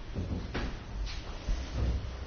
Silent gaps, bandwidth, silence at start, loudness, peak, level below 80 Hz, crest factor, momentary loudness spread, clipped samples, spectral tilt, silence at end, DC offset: none; 6.8 kHz; 0 s; -37 LUFS; -20 dBFS; -36 dBFS; 14 dB; 6 LU; under 0.1%; -5.5 dB/octave; 0 s; under 0.1%